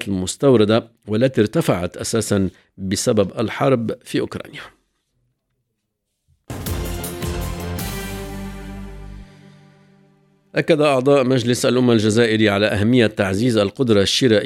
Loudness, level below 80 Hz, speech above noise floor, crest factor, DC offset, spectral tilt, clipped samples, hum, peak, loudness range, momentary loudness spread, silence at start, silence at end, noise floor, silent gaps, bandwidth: -18 LUFS; -40 dBFS; 58 dB; 18 dB; under 0.1%; -5.5 dB/octave; under 0.1%; none; 0 dBFS; 14 LU; 17 LU; 0 s; 0 s; -75 dBFS; none; 17 kHz